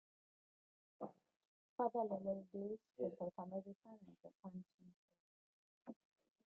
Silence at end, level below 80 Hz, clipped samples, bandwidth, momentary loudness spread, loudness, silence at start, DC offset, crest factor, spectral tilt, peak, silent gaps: 0.55 s; -90 dBFS; under 0.1%; 4.4 kHz; 20 LU; -47 LUFS; 1 s; under 0.1%; 22 dB; -9.5 dB/octave; -28 dBFS; 1.36-1.40 s, 1.47-1.78 s, 3.75-3.80 s, 4.35-4.43 s, 4.74-4.78 s, 4.96-5.08 s, 5.20-5.81 s